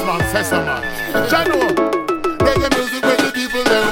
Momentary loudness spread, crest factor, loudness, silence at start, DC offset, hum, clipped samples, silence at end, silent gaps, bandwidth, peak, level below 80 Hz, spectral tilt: 5 LU; 16 dB; -17 LUFS; 0 s; under 0.1%; none; under 0.1%; 0 s; none; 17 kHz; 0 dBFS; -36 dBFS; -4 dB/octave